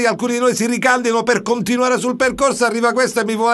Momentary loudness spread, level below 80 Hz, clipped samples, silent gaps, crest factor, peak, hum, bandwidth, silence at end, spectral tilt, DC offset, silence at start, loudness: 2 LU; -52 dBFS; under 0.1%; none; 16 dB; 0 dBFS; none; 12.5 kHz; 0 s; -3.5 dB/octave; under 0.1%; 0 s; -16 LUFS